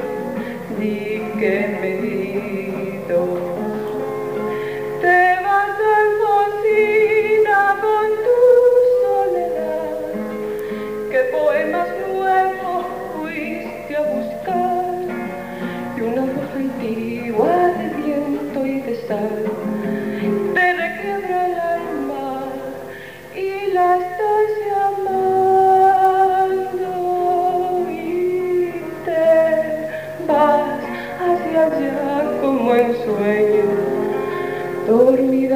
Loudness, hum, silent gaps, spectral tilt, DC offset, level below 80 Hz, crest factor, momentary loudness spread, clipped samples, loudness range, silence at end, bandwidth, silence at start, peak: -18 LUFS; none; none; -6.5 dB/octave; 0.3%; -58 dBFS; 16 dB; 11 LU; under 0.1%; 7 LU; 0 s; 15.5 kHz; 0 s; -2 dBFS